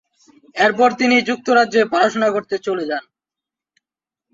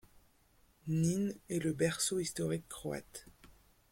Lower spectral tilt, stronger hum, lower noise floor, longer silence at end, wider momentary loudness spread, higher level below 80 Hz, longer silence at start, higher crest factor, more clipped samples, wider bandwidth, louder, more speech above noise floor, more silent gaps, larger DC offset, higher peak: about the same, -4 dB/octave vs -5 dB/octave; neither; first, -88 dBFS vs -69 dBFS; first, 1.35 s vs 0.4 s; second, 9 LU vs 14 LU; about the same, -64 dBFS vs -64 dBFS; second, 0.55 s vs 0.85 s; about the same, 18 dB vs 20 dB; neither; second, 7.8 kHz vs 16.5 kHz; first, -17 LUFS vs -36 LUFS; first, 71 dB vs 33 dB; neither; neither; first, -2 dBFS vs -18 dBFS